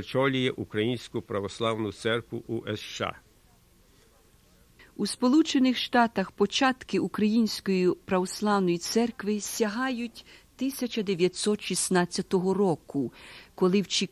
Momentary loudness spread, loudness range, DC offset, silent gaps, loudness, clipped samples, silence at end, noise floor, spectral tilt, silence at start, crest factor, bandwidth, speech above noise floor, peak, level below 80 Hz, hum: 10 LU; 8 LU; under 0.1%; none; -27 LUFS; under 0.1%; 0.05 s; -60 dBFS; -4.5 dB/octave; 0 s; 18 dB; 15 kHz; 33 dB; -8 dBFS; -60 dBFS; none